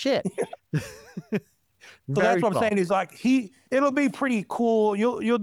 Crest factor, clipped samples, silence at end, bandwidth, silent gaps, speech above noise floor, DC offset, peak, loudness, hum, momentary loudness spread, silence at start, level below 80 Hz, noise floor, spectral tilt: 16 dB; under 0.1%; 0 s; 14.5 kHz; none; 31 dB; under 0.1%; -10 dBFS; -25 LUFS; none; 10 LU; 0 s; -64 dBFS; -55 dBFS; -6 dB/octave